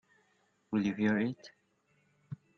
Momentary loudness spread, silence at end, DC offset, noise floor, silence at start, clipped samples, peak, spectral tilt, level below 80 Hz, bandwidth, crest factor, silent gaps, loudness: 19 LU; 0.25 s; under 0.1%; -73 dBFS; 0.7 s; under 0.1%; -18 dBFS; -7.5 dB/octave; -72 dBFS; 6.8 kHz; 18 dB; none; -33 LUFS